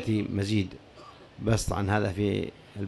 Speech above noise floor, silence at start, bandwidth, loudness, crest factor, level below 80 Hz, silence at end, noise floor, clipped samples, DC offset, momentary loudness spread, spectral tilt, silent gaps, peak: 22 dB; 0 s; 12.5 kHz; -29 LUFS; 16 dB; -44 dBFS; 0 s; -50 dBFS; under 0.1%; under 0.1%; 21 LU; -6 dB/octave; none; -12 dBFS